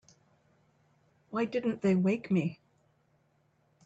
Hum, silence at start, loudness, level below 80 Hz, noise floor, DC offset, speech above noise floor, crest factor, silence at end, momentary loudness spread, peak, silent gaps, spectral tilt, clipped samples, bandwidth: none; 1.3 s; -31 LUFS; -74 dBFS; -71 dBFS; under 0.1%; 42 dB; 16 dB; 1.3 s; 9 LU; -18 dBFS; none; -8 dB/octave; under 0.1%; 7.8 kHz